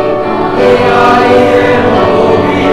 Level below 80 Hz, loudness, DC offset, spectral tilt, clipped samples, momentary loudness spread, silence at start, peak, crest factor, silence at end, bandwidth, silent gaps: -32 dBFS; -7 LUFS; under 0.1%; -6.5 dB/octave; 2%; 5 LU; 0 s; 0 dBFS; 8 dB; 0 s; 12 kHz; none